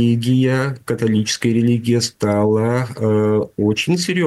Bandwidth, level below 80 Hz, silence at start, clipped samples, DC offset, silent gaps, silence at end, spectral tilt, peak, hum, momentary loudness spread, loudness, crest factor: 12.5 kHz; -54 dBFS; 0 s; under 0.1%; under 0.1%; none; 0 s; -6 dB/octave; -6 dBFS; none; 4 LU; -17 LUFS; 10 dB